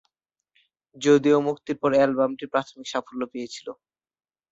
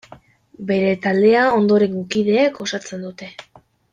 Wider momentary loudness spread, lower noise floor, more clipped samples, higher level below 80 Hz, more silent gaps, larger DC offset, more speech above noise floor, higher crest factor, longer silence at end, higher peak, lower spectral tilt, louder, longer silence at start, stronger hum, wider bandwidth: second, 15 LU vs 18 LU; first, -81 dBFS vs -46 dBFS; neither; second, -68 dBFS vs -60 dBFS; neither; neither; first, 58 dB vs 29 dB; first, 20 dB vs 14 dB; first, 0.8 s vs 0.5 s; about the same, -6 dBFS vs -4 dBFS; about the same, -5.5 dB/octave vs -5.5 dB/octave; second, -23 LUFS vs -17 LUFS; first, 0.95 s vs 0.6 s; neither; second, 8 kHz vs 9.2 kHz